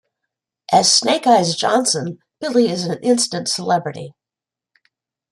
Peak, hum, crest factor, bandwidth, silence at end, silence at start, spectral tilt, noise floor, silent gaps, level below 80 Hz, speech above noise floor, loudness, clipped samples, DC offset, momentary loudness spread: -2 dBFS; none; 18 dB; 14.5 kHz; 1.2 s; 0.7 s; -3 dB/octave; -88 dBFS; none; -66 dBFS; 71 dB; -16 LUFS; under 0.1%; under 0.1%; 16 LU